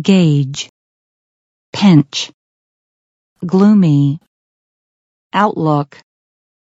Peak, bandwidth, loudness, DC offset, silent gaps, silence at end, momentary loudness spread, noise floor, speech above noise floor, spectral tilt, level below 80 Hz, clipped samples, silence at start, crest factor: 0 dBFS; 8 kHz; -13 LUFS; under 0.1%; 0.69-1.73 s, 2.34-3.36 s, 4.28-5.30 s; 0.95 s; 17 LU; under -90 dBFS; over 78 dB; -6.5 dB/octave; -60 dBFS; under 0.1%; 0 s; 16 dB